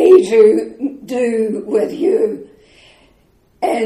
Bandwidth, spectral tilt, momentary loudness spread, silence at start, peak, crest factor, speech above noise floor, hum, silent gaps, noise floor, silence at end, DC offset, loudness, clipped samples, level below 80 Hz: 12 kHz; -6 dB/octave; 14 LU; 0 s; 0 dBFS; 14 dB; 40 dB; none; none; -54 dBFS; 0 s; under 0.1%; -15 LUFS; under 0.1%; -58 dBFS